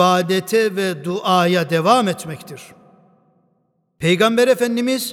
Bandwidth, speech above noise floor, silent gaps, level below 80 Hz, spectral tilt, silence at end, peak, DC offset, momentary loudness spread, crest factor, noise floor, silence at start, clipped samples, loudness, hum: 18.5 kHz; 48 dB; none; -64 dBFS; -5 dB/octave; 0 s; 0 dBFS; under 0.1%; 14 LU; 18 dB; -65 dBFS; 0 s; under 0.1%; -17 LUFS; none